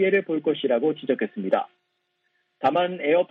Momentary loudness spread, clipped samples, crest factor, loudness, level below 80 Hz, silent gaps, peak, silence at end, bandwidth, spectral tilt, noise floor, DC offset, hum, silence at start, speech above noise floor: 4 LU; under 0.1%; 16 dB; -24 LUFS; -76 dBFS; none; -8 dBFS; 0.05 s; 5.4 kHz; -8 dB/octave; -74 dBFS; under 0.1%; none; 0 s; 51 dB